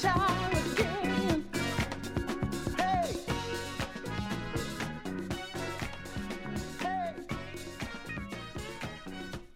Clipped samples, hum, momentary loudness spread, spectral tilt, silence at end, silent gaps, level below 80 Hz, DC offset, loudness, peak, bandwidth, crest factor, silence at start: under 0.1%; none; 11 LU; -5 dB/octave; 0 s; none; -48 dBFS; under 0.1%; -34 LUFS; -14 dBFS; 16.5 kHz; 20 dB; 0 s